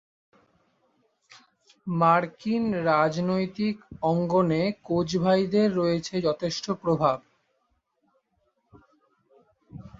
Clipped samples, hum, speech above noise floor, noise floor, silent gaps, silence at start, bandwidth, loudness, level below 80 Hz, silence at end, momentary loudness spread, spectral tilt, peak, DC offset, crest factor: under 0.1%; none; 49 dB; -73 dBFS; none; 1.85 s; 7.8 kHz; -25 LUFS; -60 dBFS; 0.1 s; 8 LU; -6.5 dB/octave; -8 dBFS; under 0.1%; 20 dB